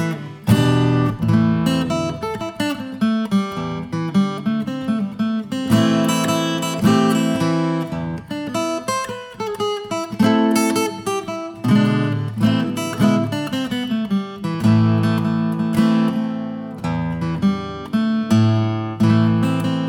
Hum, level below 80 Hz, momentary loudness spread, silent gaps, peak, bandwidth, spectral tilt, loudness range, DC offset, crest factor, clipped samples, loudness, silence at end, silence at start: none; -52 dBFS; 9 LU; none; -2 dBFS; 17.5 kHz; -6.5 dB/octave; 3 LU; under 0.1%; 16 dB; under 0.1%; -19 LUFS; 0 s; 0 s